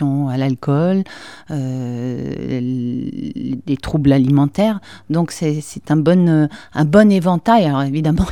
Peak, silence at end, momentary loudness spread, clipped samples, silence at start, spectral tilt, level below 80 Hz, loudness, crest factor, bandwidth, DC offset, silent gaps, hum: 0 dBFS; 0 s; 12 LU; under 0.1%; 0 s; -7.5 dB/octave; -40 dBFS; -17 LUFS; 16 dB; 13 kHz; 0.5%; none; none